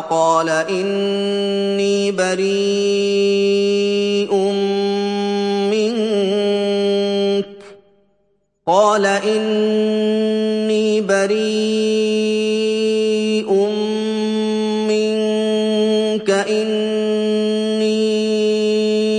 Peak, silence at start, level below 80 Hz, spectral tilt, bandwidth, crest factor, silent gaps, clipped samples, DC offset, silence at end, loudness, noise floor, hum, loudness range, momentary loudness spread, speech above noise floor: -2 dBFS; 0 s; -64 dBFS; -5 dB/octave; 10.5 kHz; 14 dB; none; under 0.1%; under 0.1%; 0 s; -17 LUFS; -64 dBFS; none; 1 LU; 3 LU; 48 dB